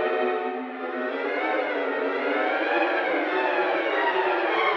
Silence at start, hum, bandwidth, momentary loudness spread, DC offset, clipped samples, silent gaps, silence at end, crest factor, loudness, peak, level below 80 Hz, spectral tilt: 0 s; none; 6.8 kHz; 6 LU; under 0.1%; under 0.1%; none; 0 s; 14 dB; -25 LUFS; -12 dBFS; under -90 dBFS; -4.5 dB/octave